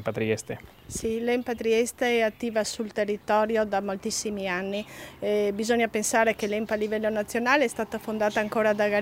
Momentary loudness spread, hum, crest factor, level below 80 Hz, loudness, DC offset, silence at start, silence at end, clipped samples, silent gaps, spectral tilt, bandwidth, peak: 8 LU; none; 20 dB; -58 dBFS; -26 LUFS; under 0.1%; 0 s; 0 s; under 0.1%; none; -3.5 dB/octave; 16 kHz; -8 dBFS